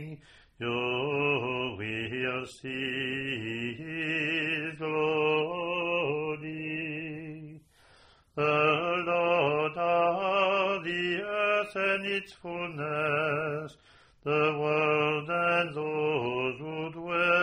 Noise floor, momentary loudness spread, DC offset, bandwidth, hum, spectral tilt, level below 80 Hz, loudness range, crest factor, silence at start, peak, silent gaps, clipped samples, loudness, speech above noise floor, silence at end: -60 dBFS; 11 LU; under 0.1%; 10.5 kHz; none; -6 dB/octave; -66 dBFS; 4 LU; 18 dB; 0 s; -12 dBFS; none; under 0.1%; -29 LUFS; 28 dB; 0 s